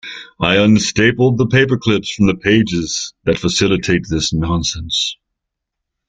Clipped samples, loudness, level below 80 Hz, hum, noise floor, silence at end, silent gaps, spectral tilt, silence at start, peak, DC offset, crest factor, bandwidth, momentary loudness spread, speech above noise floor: under 0.1%; -15 LUFS; -38 dBFS; none; -78 dBFS; 0.95 s; none; -4.5 dB/octave; 0.05 s; 0 dBFS; under 0.1%; 14 dB; 9.4 kHz; 7 LU; 63 dB